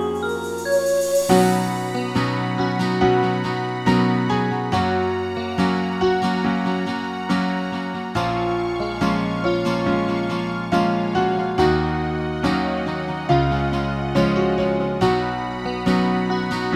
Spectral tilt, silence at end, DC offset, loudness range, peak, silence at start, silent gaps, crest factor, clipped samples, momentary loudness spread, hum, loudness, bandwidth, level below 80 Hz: -6 dB/octave; 0 s; under 0.1%; 3 LU; -2 dBFS; 0 s; none; 18 dB; under 0.1%; 6 LU; none; -21 LUFS; 16 kHz; -40 dBFS